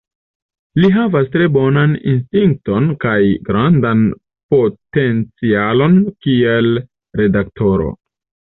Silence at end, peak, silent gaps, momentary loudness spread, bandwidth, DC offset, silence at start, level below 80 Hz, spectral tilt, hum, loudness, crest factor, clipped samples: 0.6 s; -2 dBFS; 4.43-4.49 s; 6 LU; 4.1 kHz; under 0.1%; 0.75 s; -40 dBFS; -10.5 dB/octave; none; -14 LUFS; 12 dB; under 0.1%